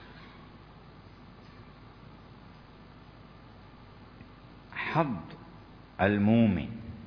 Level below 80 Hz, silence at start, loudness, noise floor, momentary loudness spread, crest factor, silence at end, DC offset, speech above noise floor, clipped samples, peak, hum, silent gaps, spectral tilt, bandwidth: -58 dBFS; 0 s; -28 LUFS; -52 dBFS; 27 LU; 24 dB; 0 s; under 0.1%; 25 dB; under 0.1%; -10 dBFS; none; none; -9.5 dB/octave; 5.4 kHz